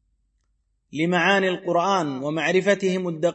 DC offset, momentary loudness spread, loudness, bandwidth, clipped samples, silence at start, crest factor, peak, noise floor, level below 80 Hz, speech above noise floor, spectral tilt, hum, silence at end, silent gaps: under 0.1%; 7 LU; -22 LUFS; 8.6 kHz; under 0.1%; 0.95 s; 18 dB; -6 dBFS; -70 dBFS; -68 dBFS; 49 dB; -5 dB/octave; none; 0 s; none